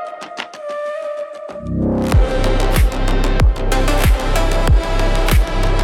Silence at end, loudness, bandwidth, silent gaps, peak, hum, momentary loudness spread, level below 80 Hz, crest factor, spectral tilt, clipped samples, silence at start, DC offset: 0 s; -18 LUFS; 16.5 kHz; none; -2 dBFS; none; 12 LU; -16 dBFS; 12 dB; -5.5 dB/octave; under 0.1%; 0 s; under 0.1%